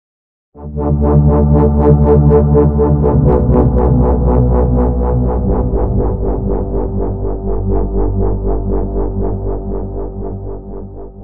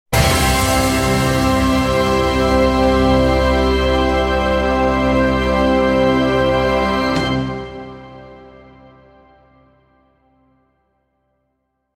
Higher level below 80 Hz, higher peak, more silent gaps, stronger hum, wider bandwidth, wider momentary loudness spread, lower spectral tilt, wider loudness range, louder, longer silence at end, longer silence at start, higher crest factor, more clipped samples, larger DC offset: first, -16 dBFS vs -26 dBFS; about the same, 0 dBFS vs -2 dBFS; neither; neither; second, 2.5 kHz vs 16.5 kHz; first, 14 LU vs 4 LU; first, -14.5 dB/octave vs -5 dB/octave; about the same, 8 LU vs 8 LU; about the same, -14 LUFS vs -15 LUFS; second, 0 s vs 3.45 s; first, 0.5 s vs 0.1 s; about the same, 12 dB vs 14 dB; neither; neither